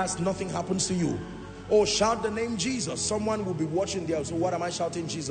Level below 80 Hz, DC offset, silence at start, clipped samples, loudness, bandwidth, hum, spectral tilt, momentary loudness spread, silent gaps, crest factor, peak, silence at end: -52 dBFS; under 0.1%; 0 s; under 0.1%; -28 LUFS; 9.4 kHz; none; -4 dB/octave; 7 LU; none; 18 dB; -10 dBFS; 0 s